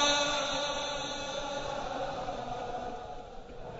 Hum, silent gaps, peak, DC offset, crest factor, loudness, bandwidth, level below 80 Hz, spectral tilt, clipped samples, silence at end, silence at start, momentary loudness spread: none; none; -14 dBFS; under 0.1%; 20 dB; -34 LUFS; 8 kHz; -50 dBFS; -2 dB/octave; under 0.1%; 0 s; 0 s; 15 LU